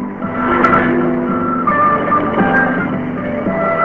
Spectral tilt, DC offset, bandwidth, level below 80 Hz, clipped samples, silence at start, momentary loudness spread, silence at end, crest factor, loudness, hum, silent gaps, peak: -9 dB/octave; 0.5%; 5.6 kHz; -40 dBFS; under 0.1%; 0 s; 8 LU; 0 s; 14 dB; -14 LUFS; none; none; 0 dBFS